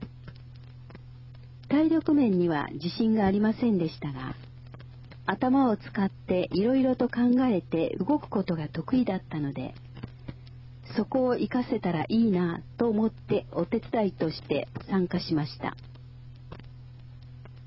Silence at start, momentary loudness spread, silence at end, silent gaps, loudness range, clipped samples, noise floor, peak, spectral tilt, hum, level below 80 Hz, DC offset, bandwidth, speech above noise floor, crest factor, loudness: 0 s; 23 LU; 0 s; none; 5 LU; under 0.1%; -46 dBFS; -10 dBFS; -10.5 dB/octave; none; -54 dBFS; under 0.1%; 5.8 kHz; 19 dB; 18 dB; -27 LUFS